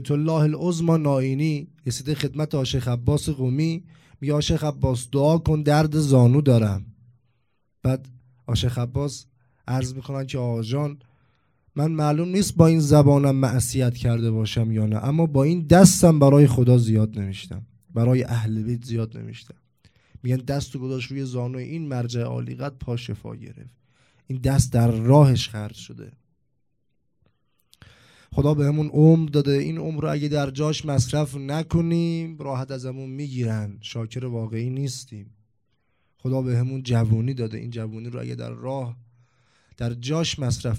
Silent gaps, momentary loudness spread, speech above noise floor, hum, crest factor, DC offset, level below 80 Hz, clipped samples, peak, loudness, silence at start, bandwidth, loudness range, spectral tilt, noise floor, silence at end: none; 16 LU; 53 dB; none; 22 dB; under 0.1%; -46 dBFS; under 0.1%; 0 dBFS; -22 LUFS; 0 s; 15 kHz; 12 LU; -6.5 dB/octave; -74 dBFS; 0 s